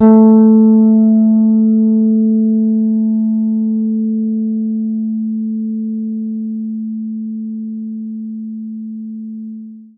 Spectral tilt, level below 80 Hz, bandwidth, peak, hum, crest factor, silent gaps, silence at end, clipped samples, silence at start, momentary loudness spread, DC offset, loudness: -15 dB/octave; -66 dBFS; 1.6 kHz; 0 dBFS; none; 14 dB; none; 0.1 s; under 0.1%; 0 s; 17 LU; under 0.1%; -13 LUFS